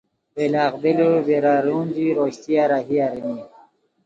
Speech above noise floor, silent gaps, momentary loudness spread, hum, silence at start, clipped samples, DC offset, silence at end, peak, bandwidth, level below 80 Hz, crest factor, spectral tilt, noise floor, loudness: 34 dB; none; 10 LU; none; 0.35 s; under 0.1%; under 0.1%; 0.6 s; -6 dBFS; 7.8 kHz; -66 dBFS; 14 dB; -7.5 dB/octave; -53 dBFS; -20 LUFS